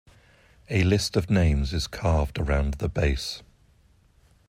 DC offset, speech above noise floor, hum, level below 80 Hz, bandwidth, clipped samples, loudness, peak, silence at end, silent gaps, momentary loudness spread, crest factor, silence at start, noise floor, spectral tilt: under 0.1%; 36 dB; none; -34 dBFS; 15.5 kHz; under 0.1%; -25 LUFS; -10 dBFS; 1.1 s; none; 7 LU; 16 dB; 0.7 s; -60 dBFS; -6 dB/octave